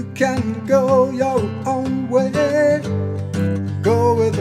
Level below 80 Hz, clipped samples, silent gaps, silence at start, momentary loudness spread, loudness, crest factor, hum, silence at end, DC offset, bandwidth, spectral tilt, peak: -50 dBFS; under 0.1%; none; 0 s; 6 LU; -18 LUFS; 16 dB; none; 0 s; under 0.1%; 13.5 kHz; -7 dB/octave; -2 dBFS